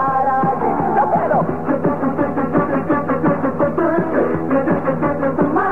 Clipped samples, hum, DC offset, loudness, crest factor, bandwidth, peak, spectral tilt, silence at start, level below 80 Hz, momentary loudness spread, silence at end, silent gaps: under 0.1%; none; 2%; -17 LUFS; 12 dB; 4.4 kHz; -4 dBFS; -10.5 dB/octave; 0 s; -48 dBFS; 3 LU; 0 s; none